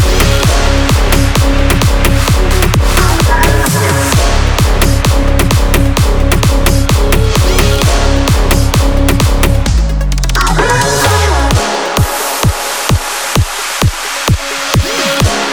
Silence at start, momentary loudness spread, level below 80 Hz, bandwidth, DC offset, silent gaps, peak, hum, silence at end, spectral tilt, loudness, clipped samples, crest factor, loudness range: 0 s; 3 LU; -12 dBFS; over 20 kHz; under 0.1%; none; 0 dBFS; none; 0 s; -4.5 dB/octave; -11 LUFS; under 0.1%; 10 dB; 2 LU